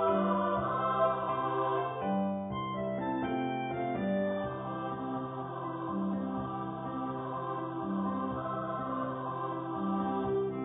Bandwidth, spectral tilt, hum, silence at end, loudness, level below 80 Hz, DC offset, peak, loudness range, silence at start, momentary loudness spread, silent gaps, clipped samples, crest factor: 3.9 kHz; -4 dB/octave; none; 0 s; -34 LUFS; -60 dBFS; under 0.1%; -18 dBFS; 4 LU; 0 s; 7 LU; none; under 0.1%; 16 dB